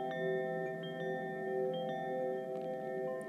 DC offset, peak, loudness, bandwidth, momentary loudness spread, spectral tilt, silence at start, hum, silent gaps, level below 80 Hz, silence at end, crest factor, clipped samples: under 0.1%; -26 dBFS; -39 LUFS; 13.5 kHz; 4 LU; -7 dB/octave; 0 s; none; none; -86 dBFS; 0 s; 12 dB; under 0.1%